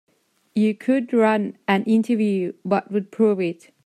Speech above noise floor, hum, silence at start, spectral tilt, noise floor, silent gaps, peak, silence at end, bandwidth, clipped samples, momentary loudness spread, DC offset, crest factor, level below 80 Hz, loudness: 22 dB; none; 0.55 s; -7.5 dB/octave; -42 dBFS; none; -8 dBFS; 0.3 s; 10 kHz; under 0.1%; 7 LU; under 0.1%; 14 dB; -72 dBFS; -21 LUFS